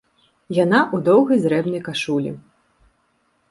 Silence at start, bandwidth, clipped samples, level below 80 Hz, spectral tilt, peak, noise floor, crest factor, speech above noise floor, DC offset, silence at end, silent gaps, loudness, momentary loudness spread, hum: 0.5 s; 11.5 kHz; under 0.1%; -62 dBFS; -6.5 dB/octave; -2 dBFS; -65 dBFS; 18 dB; 47 dB; under 0.1%; 1.1 s; none; -19 LUFS; 9 LU; none